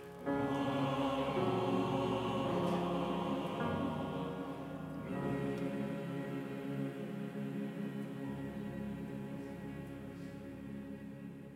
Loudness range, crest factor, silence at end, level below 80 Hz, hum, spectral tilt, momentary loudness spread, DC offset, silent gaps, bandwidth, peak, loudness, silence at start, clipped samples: 9 LU; 16 dB; 0 s; -62 dBFS; none; -7.5 dB/octave; 12 LU; under 0.1%; none; 16 kHz; -24 dBFS; -39 LUFS; 0 s; under 0.1%